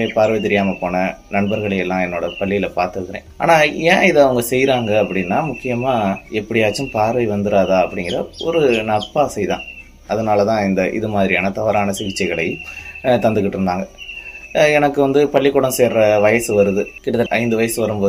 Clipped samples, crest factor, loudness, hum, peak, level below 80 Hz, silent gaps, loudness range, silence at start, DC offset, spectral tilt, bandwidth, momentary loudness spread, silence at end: under 0.1%; 16 dB; -17 LUFS; none; 0 dBFS; -44 dBFS; none; 3 LU; 0 s; under 0.1%; -5 dB/octave; 15.5 kHz; 9 LU; 0 s